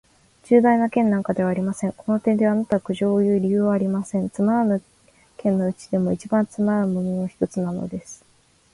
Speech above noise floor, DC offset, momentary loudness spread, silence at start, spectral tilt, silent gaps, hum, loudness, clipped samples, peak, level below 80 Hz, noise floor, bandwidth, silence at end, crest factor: 38 dB; under 0.1%; 8 LU; 0.5 s; -8 dB/octave; none; none; -22 LUFS; under 0.1%; -4 dBFS; -58 dBFS; -59 dBFS; 11.5 kHz; 0.6 s; 18 dB